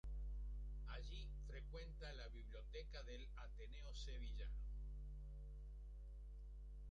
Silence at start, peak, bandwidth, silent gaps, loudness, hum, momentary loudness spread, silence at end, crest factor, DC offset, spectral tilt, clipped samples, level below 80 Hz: 0.05 s; -40 dBFS; 7.6 kHz; none; -55 LUFS; 50 Hz at -50 dBFS; 6 LU; 0 s; 10 dB; under 0.1%; -5.5 dB/octave; under 0.1%; -52 dBFS